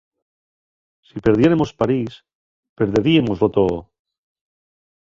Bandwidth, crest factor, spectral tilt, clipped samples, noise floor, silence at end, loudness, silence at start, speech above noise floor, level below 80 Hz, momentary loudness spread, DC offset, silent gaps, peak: 7.4 kHz; 18 dB; -7.5 dB/octave; under 0.1%; under -90 dBFS; 1.25 s; -18 LUFS; 1.15 s; over 73 dB; -46 dBFS; 12 LU; under 0.1%; 2.35-2.63 s, 2.69-2.76 s; -2 dBFS